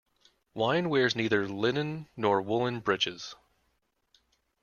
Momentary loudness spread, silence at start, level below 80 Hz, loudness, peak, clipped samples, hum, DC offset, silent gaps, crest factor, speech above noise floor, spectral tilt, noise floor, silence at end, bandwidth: 10 LU; 0.55 s; -68 dBFS; -29 LUFS; -12 dBFS; under 0.1%; none; under 0.1%; none; 20 dB; 47 dB; -5 dB/octave; -76 dBFS; 1.3 s; 7.2 kHz